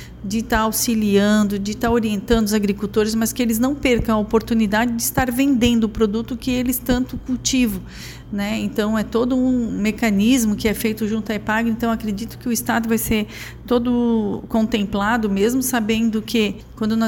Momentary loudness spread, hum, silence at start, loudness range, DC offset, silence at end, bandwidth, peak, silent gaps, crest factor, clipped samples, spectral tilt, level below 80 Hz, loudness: 7 LU; none; 0 s; 3 LU; under 0.1%; 0 s; 19 kHz; -4 dBFS; none; 16 dB; under 0.1%; -4.5 dB/octave; -38 dBFS; -19 LUFS